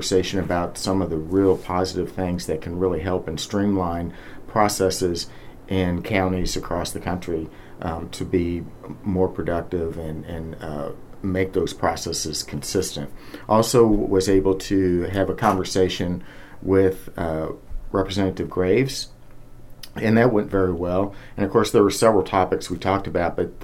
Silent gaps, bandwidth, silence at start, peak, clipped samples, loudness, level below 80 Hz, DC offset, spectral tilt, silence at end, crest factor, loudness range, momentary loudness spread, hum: none; 16 kHz; 0 s; -2 dBFS; under 0.1%; -23 LUFS; -40 dBFS; under 0.1%; -5.5 dB/octave; 0 s; 20 dB; 6 LU; 14 LU; none